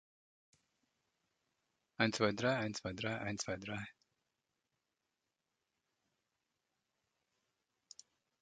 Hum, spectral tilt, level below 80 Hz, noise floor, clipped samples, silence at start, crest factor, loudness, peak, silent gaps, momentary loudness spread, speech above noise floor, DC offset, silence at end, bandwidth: none; -4.5 dB/octave; -72 dBFS; -89 dBFS; under 0.1%; 2 s; 28 dB; -38 LUFS; -16 dBFS; none; 25 LU; 51 dB; under 0.1%; 4.5 s; 9 kHz